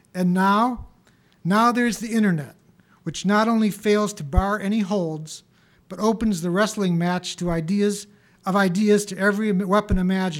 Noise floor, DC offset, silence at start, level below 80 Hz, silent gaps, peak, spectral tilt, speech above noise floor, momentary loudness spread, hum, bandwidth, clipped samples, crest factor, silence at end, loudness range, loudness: -58 dBFS; under 0.1%; 0.15 s; -38 dBFS; none; -4 dBFS; -6 dB/octave; 37 dB; 14 LU; none; 16 kHz; under 0.1%; 18 dB; 0 s; 2 LU; -22 LUFS